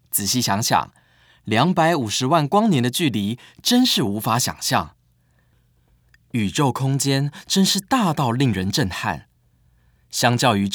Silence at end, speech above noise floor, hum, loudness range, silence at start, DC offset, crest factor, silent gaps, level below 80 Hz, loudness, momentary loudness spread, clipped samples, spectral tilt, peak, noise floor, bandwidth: 0 s; 41 dB; none; 4 LU; 0.15 s; under 0.1%; 20 dB; none; -58 dBFS; -20 LUFS; 9 LU; under 0.1%; -4 dB/octave; 0 dBFS; -61 dBFS; over 20 kHz